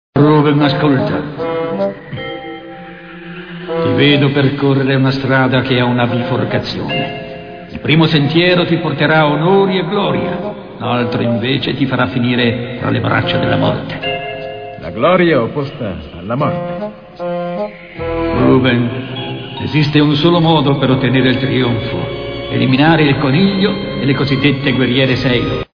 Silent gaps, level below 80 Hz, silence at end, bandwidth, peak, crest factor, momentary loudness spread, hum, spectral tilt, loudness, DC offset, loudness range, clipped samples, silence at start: none; -40 dBFS; 0.1 s; 5.4 kHz; 0 dBFS; 14 dB; 14 LU; none; -8.5 dB/octave; -14 LUFS; under 0.1%; 4 LU; under 0.1%; 0.15 s